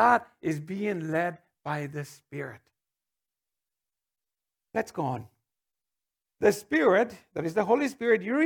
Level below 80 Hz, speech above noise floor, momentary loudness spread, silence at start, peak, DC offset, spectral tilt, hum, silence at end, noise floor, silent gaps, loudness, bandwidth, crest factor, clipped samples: -72 dBFS; over 63 dB; 16 LU; 0 s; -8 dBFS; under 0.1%; -6 dB/octave; none; 0 s; under -90 dBFS; none; -28 LUFS; 19 kHz; 22 dB; under 0.1%